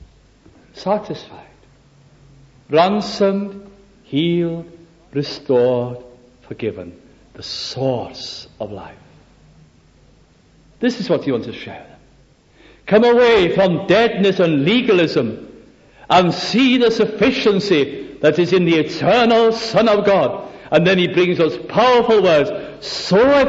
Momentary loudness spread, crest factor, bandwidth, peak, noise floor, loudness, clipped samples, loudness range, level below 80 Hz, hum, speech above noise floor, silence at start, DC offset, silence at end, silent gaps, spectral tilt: 17 LU; 16 dB; 8 kHz; -2 dBFS; -51 dBFS; -16 LUFS; under 0.1%; 12 LU; -50 dBFS; none; 36 dB; 0 s; under 0.1%; 0 s; none; -6 dB/octave